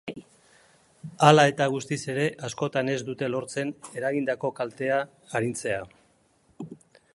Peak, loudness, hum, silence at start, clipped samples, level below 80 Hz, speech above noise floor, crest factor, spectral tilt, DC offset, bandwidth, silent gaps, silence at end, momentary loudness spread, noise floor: 0 dBFS; -26 LUFS; none; 0.05 s; under 0.1%; -68 dBFS; 39 dB; 26 dB; -5 dB/octave; under 0.1%; 11.5 kHz; none; 0.4 s; 24 LU; -64 dBFS